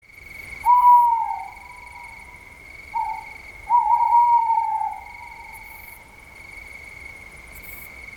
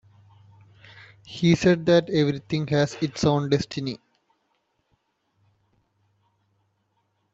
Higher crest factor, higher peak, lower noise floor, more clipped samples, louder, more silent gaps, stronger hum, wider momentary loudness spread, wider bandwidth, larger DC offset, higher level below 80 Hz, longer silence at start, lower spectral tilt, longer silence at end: about the same, 16 dB vs 20 dB; about the same, -6 dBFS vs -6 dBFS; second, -44 dBFS vs -72 dBFS; neither; first, -19 LUFS vs -23 LUFS; neither; neither; first, 24 LU vs 13 LU; first, 18.5 kHz vs 8 kHz; neither; first, -52 dBFS vs -58 dBFS; second, 0.3 s vs 1.25 s; second, -2.5 dB/octave vs -6.5 dB/octave; second, 0 s vs 3.4 s